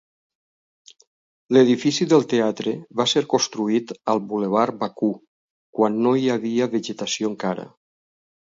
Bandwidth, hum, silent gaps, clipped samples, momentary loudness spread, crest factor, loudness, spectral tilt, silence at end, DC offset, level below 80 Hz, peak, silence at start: 7.8 kHz; none; 5.28-5.73 s; under 0.1%; 9 LU; 18 dB; -21 LUFS; -4.5 dB/octave; 0.85 s; under 0.1%; -70 dBFS; -4 dBFS; 1.5 s